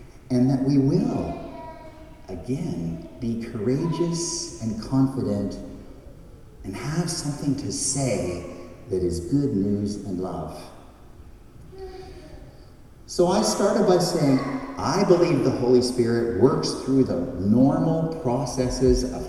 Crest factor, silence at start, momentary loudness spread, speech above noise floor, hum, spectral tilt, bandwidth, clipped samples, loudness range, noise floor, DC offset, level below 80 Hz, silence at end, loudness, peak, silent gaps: 20 dB; 0 s; 19 LU; 23 dB; none; -6 dB/octave; 13 kHz; under 0.1%; 8 LU; -46 dBFS; under 0.1%; -42 dBFS; 0 s; -23 LUFS; -4 dBFS; none